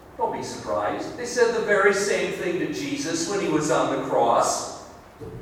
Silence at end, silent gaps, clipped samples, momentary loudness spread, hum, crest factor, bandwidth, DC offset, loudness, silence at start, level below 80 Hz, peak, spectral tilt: 0 s; none; under 0.1%; 11 LU; none; 20 dB; 16.5 kHz; under 0.1%; -23 LUFS; 0 s; -56 dBFS; -4 dBFS; -3.5 dB/octave